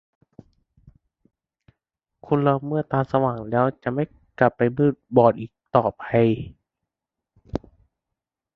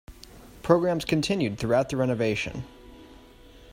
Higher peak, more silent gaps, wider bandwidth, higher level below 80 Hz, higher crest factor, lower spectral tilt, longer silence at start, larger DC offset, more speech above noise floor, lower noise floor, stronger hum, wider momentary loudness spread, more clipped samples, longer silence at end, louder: first, -2 dBFS vs -6 dBFS; neither; second, 6 kHz vs 16 kHz; about the same, -54 dBFS vs -50 dBFS; about the same, 22 dB vs 22 dB; first, -10 dB/octave vs -6 dB/octave; first, 2.25 s vs 0.1 s; neither; first, 65 dB vs 25 dB; first, -86 dBFS vs -50 dBFS; neither; about the same, 14 LU vs 13 LU; neither; first, 0.95 s vs 0 s; first, -22 LUFS vs -26 LUFS